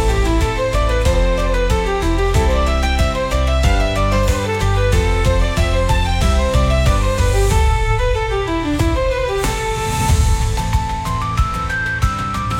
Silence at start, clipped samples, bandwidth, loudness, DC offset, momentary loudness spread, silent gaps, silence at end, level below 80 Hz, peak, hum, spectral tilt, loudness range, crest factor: 0 s; under 0.1%; 16.5 kHz; -17 LUFS; under 0.1%; 4 LU; none; 0 s; -18 dBFS; -2 dBFS; none; -5.5 dB/octave; 2 LU; 12 dB